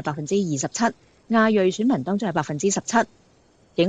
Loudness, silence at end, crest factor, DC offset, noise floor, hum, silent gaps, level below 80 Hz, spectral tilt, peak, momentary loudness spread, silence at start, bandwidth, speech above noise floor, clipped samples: -23 LUFS; 0 s; 18 dB; under 0.1%; -58 dBFS; none; none; -62 dBFS; -4.5 dB/octave; -4 dBFS; 6 LU; 0 s; 9.4 kHz; 36 dB; under 0.1%